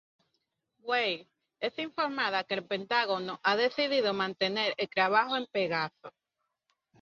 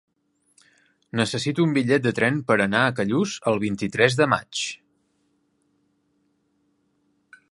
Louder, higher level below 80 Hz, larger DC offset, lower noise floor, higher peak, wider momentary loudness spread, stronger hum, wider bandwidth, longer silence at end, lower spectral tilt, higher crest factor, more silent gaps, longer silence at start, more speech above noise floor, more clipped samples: second, -30 LUFS vs -22 LUFS; second, -78 dBFS vs -60 dBFS; neither; first, -84 dBFS vs -69 dBFS; second, -10 dBFS vs -2 dBFS; about the same, 8 LU vs 9 LU; neither; second, 7.2 kHz vs 11.5 kHz; second, 0.95 s vs 2.75 s; about the same, -4.5 dB/octave vs -5 dB/octave; about the same, 20 dB vs 24 dB; neither; second, 0.85 s vs 1.15 s; first, 54 dB vs 47 dB; neither